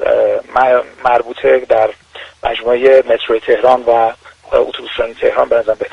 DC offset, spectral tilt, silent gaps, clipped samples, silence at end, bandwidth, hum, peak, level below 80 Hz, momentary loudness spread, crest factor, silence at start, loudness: under 0.1%; -5 dB/octave; none; under 0.1%; 0.05 s; 9.2 kHz; none; 0 dBFS; -44 dBFS; 9 LU; 12 dB; 0 s; -13 LUFS